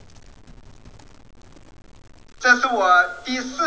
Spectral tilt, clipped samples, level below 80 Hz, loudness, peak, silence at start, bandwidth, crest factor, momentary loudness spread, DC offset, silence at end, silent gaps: -2 dB/octave; under 0.1%; -52 dBFS; -18 LUFS; -2 dBFS; 2.4 s; 8 kHz; 22 dB; 10 LU; 0.4%; 0 s; none